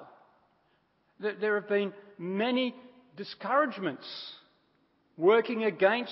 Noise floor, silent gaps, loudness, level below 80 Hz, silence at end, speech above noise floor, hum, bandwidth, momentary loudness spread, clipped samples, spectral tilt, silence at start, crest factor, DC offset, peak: -71 dBFS; none; -29 LUFS; -88 dBFS; 0 s; 42 dB; none; 5.8 kHz; 17 LU; under 0.1%; -9 dB/octave; 0 s; 22 dB; under 0.1%; -10 dBFS